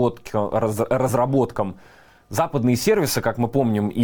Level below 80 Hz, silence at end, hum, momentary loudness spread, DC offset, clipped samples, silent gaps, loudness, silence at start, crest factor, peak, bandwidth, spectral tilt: -48 dBFS; 0 s; none; 6 LU; under 0.1%; under 0.1%; none; -21 LUFS; 0 s; 14 dB; -6 dBFS; over 20 kHz; -6 dB/octave